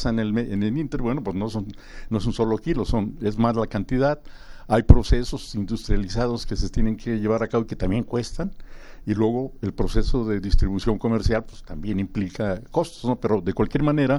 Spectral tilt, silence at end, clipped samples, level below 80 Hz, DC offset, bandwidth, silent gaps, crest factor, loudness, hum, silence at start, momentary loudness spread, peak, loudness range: -7.5 dB/octave; 0 s; under 0.1%; -28 dBFS; under 0.1%; 11.5 kHz; none; 22 dB; -24 LUFS; none; 0 s; 7 LU; 0 dBFS; 3 LU